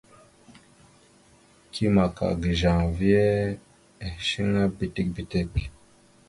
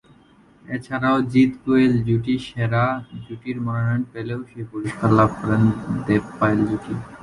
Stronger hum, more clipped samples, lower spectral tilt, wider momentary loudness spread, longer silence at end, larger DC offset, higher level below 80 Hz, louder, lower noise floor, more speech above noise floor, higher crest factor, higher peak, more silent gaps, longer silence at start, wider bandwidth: neither; neither; second, -7 dB/octave vs -8.5 dB/octave; first, 16 LU vs 13 LU; first, 0.6 s vs 0 s; neither; first, -40 dBFS vs -48 dBFS; second, -25 LUFS vs -21 LUFS; first, -57 dBFS vs -52 dBFS; about the same, 33 dB vs 32 dB; about the same, 20 dB vs 18 dB; second, -8 dBFS vs -4 dBFS; neither; second, 0.5 s vs 0.7 s; about the same, 11.5 kHz vs 11 kHz